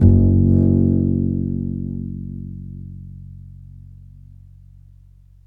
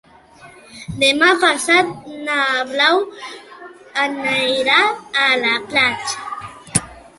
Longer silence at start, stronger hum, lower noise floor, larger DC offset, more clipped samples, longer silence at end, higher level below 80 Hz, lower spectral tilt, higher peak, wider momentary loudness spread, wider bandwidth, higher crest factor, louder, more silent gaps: second, 0 s vs 0.4 s; neither; first, -47 dBFS vs -39 dBFS; neither; neither; first, 1.4 s vs 0.2 s; first, -32 dBFS vs -52 dBFS; first, -14 dB/octave vs -2 dB/octave; about the same, 0 dBFS vs 0 dBFS; first, 25 LU vs 17 LU; second, 1.2 kHz vs 12 kHz; about the same, 20 dB vs 18 dB; about the same, -18 LUFS vs -16 LUFS; neither